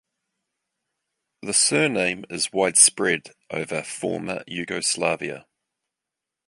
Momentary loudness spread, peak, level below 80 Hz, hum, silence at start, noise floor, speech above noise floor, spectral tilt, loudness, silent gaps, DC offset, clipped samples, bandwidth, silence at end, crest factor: 16 LU; -2 dBFS; -64 dBFS; none; 1.45 s; -86 dBFS; 63 dB; -2 dB/octave; -21 LUFS; none; under 0.1%; under 0.1%; 11.5 kHz; 1.05 s; 24 dB